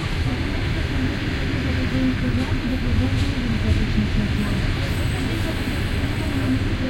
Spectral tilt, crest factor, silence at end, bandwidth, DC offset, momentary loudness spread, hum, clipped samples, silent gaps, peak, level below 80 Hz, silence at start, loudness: -6.5 dB/octave; 14 dB; 0 s; 16.5 kHz; under 0.1%; 3 LU; none; under 0.1%; none; -8 dBFS; -28 dBFS; 0 s; -23 LUFS